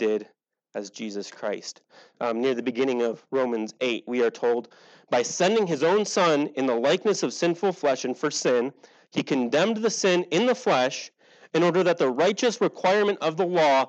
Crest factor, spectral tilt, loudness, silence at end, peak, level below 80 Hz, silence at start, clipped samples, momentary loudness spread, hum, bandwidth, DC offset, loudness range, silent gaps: 16 dB; -4 dB/octave; -24 LUFS; 0 s; -8 dBFS; -90 dBFS; 0 s; under 0.1%; 10 LU; none; 8.8 kHz; under 0.1%; 5 LU; none